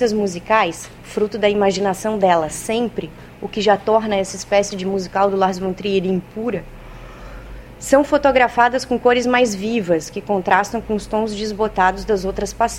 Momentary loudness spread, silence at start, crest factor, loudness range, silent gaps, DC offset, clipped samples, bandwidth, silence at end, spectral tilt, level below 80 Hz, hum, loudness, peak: 16 LU; 0 s; 18 dB; 4 LU; none; under 0.1%; under 0.1%; 16.5 kHz; 0 s; -4.5 dB/octave; -42 dBFS; none; -18 LUFS; 0 dBFS